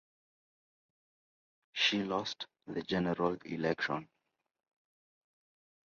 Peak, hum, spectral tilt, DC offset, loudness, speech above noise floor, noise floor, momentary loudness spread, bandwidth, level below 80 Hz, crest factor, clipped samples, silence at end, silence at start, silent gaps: -16 dBFS; none; -2.5 dB/octave; under 0.1%; -35 LUFS; over 55 dB; under -90 dBFS; 12 LU; 7.2 kHz; -70 dBFS; 22 dB; under 0.1%; 1.8 s; 1.75 s; none